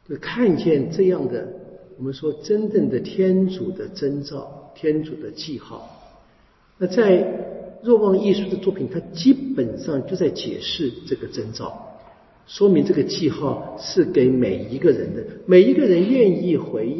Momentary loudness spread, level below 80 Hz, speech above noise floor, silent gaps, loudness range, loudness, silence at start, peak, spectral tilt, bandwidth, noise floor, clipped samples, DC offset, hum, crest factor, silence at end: 16 LU; -54 dBFS; 36 dB; none; 7 LU; -20 LUFS; 0.1 s; -2 dBFS; -7 dB/octave; 6.2 kHz; -56 dBFS; under 0.1%; under 0.1%; none; 18 dB; 0 s